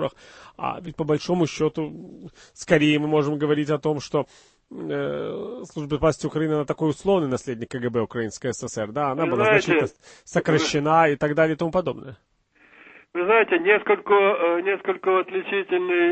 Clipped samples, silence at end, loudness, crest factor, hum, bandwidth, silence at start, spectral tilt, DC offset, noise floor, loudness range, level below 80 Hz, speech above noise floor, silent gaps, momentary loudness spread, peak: under 0.1%; 0 s; -23 LUFS; 20 dB; none; 8.8 kHz; 0 s; -5.5 dB/octave; under 0.1%; -56 dBFS; 4 LU; -54 dBFS; 33 dB; none; 13 LU; -4 dBFS